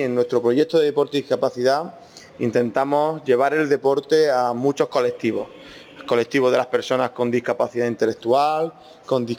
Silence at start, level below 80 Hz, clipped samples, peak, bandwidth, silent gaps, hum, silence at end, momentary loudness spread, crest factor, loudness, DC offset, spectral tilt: 0 s; -68 dBFS; under 0.1%; -6 dBFS; 14.5 kHz; none; none; 0 s; 7 LU; 14 dB; -21 LUFS; under 0.1%; -5.5 dB/octave